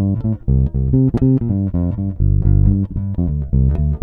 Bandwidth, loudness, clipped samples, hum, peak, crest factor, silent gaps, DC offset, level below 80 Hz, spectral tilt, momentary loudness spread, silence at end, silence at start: 2 kHz; -17 LUFS; under 0.1%; none; -2 dBFS; 14 dB; none; under 0.1%; -20 dBFS; -13.5 dB/octave; 6 LU; 0 s; 0 s